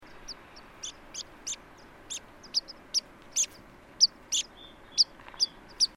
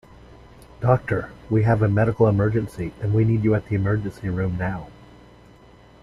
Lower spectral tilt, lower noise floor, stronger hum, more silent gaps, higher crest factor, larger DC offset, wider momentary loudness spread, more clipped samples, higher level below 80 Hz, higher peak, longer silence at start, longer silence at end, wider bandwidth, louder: second, 1.5 dB/octave vs -10 dB/octave; about the same, -52 dBFS vs -49 dBFS; neither; neither; about the same, 24 dB vs 20 dB; neither; first, 20 LU vs 10 LU; neither; second, -60 dBFS vs -44 dBFS; second, -10 dBFS vs -2 dBFS; second, 0.05 s vs 0.8 s; second, 0.1 s vs 1.1 s; first, 16 kHz vs 5.8 kHz; second, -29 LUFS vs -22 LUFS